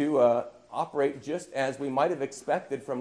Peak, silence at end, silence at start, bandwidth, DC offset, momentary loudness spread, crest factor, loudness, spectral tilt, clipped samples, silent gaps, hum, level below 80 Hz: -10 dBFS; 0 s; 0 s; 11 kHz; under 0.1%; 10 LU; 18 dB; -29 LUFS; -5.5 dB/octave; under 0.1%; none; none; -74 dBFS